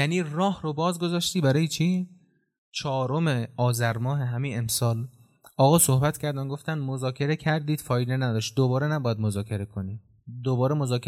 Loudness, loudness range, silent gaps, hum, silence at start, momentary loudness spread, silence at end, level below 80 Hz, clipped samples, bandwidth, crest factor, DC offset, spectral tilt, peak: -26 LUFS; 3 LU; 2.58-2.72 s; none; 0 s; 10 LU; 0 s; -60 dBFS; under 0.1%; 16 kHz; 18 dB; under 0.1%; -5.5 dB/octave; -8 dBFS